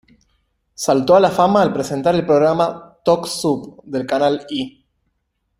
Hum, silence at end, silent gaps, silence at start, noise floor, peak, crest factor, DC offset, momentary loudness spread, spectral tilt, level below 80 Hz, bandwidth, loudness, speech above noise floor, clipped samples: none; 0.9 s; none; 0.8 s; -71 dBFS; 0 dBFS; 18 dB; under 0.1%; 12 LU; -5.5 dB/octave; -54 dBFS; 16 kHz; -17 LUFS; 54 dB; under 0.1%